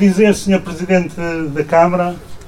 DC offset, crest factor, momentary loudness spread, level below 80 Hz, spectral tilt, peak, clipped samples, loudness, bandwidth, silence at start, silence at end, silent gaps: under 0.1%; 14 dB; 9 LU; -40 dBFS; -6.5 dB/octave; 0 dBFS; under 0.1%; -15 LUFS; 13.5 kHz; 0 s; 0 s; none